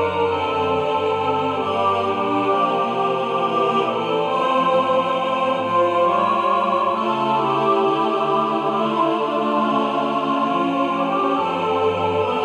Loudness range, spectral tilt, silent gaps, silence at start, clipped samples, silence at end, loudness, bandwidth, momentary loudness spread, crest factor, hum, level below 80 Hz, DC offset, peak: 1 LU; -6 dB/octave; none; 0 s; under 0.1%; 0 s; -19 LUFS; 11 kHz; 3 LU; 12 dB; none; -66 dBFS; under 0.1%; -6 dBFS